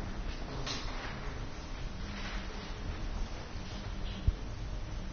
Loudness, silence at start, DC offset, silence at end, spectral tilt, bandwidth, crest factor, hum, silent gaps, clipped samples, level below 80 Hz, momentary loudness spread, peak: -41 LUFS; 0 s; under 0.1%; 0 s; -4.5 dB/octave; 6.8 kHz; 22 dB; none; none; under 0.1%; -40 dBFS; 7 LU; -16 dBFS